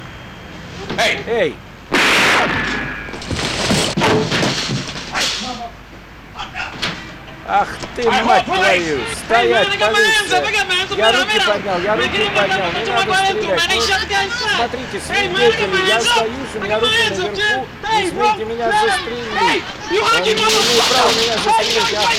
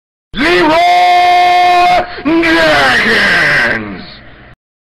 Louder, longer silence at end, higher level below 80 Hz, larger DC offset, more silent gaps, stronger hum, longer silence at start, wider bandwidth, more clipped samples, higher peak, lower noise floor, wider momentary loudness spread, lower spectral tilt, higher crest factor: second, -15 LUFS vs -8 LUFS; second, 0 s vs 0.75 s; second, -42 dBFS vs -36 dBFS; neither; neither; neither; second, 0 s vs 0.35 s; first, 17 kHz vs 14 kHz; neither; about the same, 0 dBFS vs -2 dBFS; about the same, -37 dBFS vs -34 dBFS; first, 12 LU vs 8 LU; second, -2.5 dB/octave vs -4 dB/octave; first, 16 dB vs 8 dB